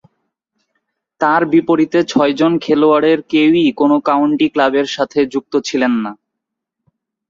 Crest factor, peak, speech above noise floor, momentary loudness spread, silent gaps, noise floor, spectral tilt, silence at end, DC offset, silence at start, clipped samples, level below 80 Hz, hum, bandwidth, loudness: 14 dB; -2 dBFS; 66 dB; 6 LU; none; -79 dBFS; -5.5 dB/octave; 1.15 s; under 0.1%; 1.2 s; under 0.1%; -58 dBFS; none; 7.6 kHz; -14 LUFS